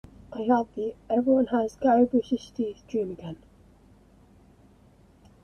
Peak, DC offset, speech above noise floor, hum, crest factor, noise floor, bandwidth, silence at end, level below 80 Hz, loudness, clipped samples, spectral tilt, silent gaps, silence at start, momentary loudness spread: -10 dBFS; under 0.1%; 32 dB; none; 18 dB; -57 dBFS; 6.8 kHz; 2.1 s; -58 dBFS; -26 LUFS; under 0.1%; -7 dB/octave; none; 0.3 s; 16 LU